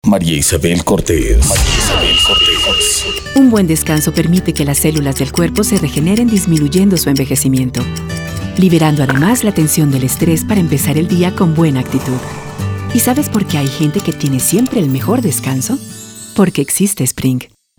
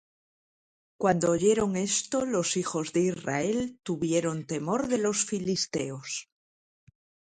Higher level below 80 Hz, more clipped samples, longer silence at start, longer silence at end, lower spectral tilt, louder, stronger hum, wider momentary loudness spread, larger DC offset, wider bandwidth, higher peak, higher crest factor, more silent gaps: first, -26 dBFS vs -62 dBFS; neither; second, 0.05 s vs 1 s; second, 0.35 s vs 1.05 s; about the same, -4.5 dB/octave vs -4 dB/octave; first, -12 LUFS vs -28 LUFS; neither; about the same, 8 LU vs 9 LU; neither; first, over 20 kHz vs 9.6 kHz; first, 0 dBFS vs -10 dBFS; second, 12 dB vs 20 dB; neither